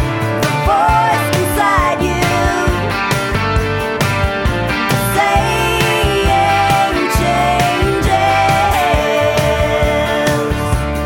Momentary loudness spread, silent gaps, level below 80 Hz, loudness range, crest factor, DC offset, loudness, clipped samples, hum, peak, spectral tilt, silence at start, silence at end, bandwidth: 4 LU; none; -24 dBFS; 2 LU; 14 dB; under 0.1%; -14 LUFS; under 0.1%; none; 0 dBFS; -5 dB/octave; 0 s; 0 s; 17 kHz